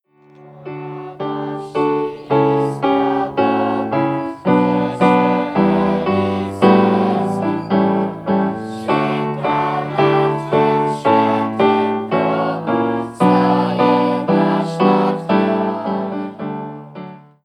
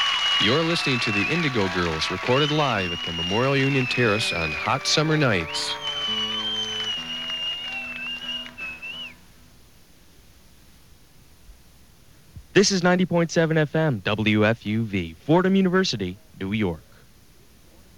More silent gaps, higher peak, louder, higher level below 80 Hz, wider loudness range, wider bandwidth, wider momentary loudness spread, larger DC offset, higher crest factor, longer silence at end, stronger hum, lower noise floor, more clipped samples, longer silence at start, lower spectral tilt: neither; first, 0 dBFS vs -4 dBFS; first, -17 LUFS vs -22 LUFS; about the same, -56 dBFS vs -52 dBFS; second, 3 LU vs 11 LU; second, 11 kHz vs 17 kHz; about the same, 11 LU vs 10 LU; second, under 0.1% vs 0.2%; about the same, 16 dB vs 20 dB; second, 0.25 s vs 1.15 s; neither; second, -45 dBFS vs -54 dBFS; neither; first, 0.4 s vs 0 s; first, -8 dB/octave vs -4.5 dB/octave